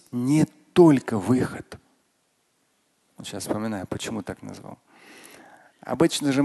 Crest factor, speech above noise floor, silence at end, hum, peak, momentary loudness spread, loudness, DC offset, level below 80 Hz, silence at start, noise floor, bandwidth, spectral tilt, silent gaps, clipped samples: 22 dB; 47 dB; 0 s; none; -4 dBFS; 23 LU; -23 LUFS; under 0.1%; -58 dBFS; 0.15 s; -69 dBFS; 12.5 kHz; -6 dB/octave; none; under 0.1%